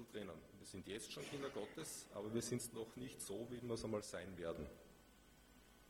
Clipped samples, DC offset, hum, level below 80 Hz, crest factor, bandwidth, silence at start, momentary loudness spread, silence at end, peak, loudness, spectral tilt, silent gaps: under 0.1%; under 0.1%; none; -70 dBFS; 20 dB; over 20 kHz; 0 s; 21 LU; 0 s; -30 dBFS; -49 LUFS; -4.5 dB/octave; none